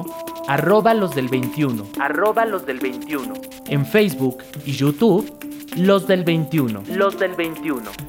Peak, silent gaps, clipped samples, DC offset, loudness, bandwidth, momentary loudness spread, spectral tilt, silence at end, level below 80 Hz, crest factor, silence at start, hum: -4 dBFS; none; under 0.1%; under 0.1%; -20 LUFS; 17.5 kHz; 12 LU; -6.5 dB/octave; 0 s; -58 dBFS; 16 dB; 0 s; none